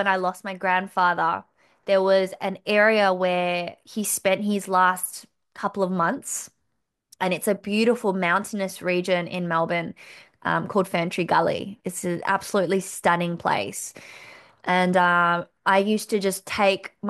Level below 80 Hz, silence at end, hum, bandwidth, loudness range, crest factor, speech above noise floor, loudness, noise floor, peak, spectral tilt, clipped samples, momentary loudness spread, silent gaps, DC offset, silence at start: -68 dBFS; 0 s; none; 12.5 kHz; 3 LU; 18 dB; 54 dB; -23 LUFS; -77 dBFS; -6 dBFS; -4 dB/octave; under 0.1%; 12 LU; none; under 0.1%; 0 s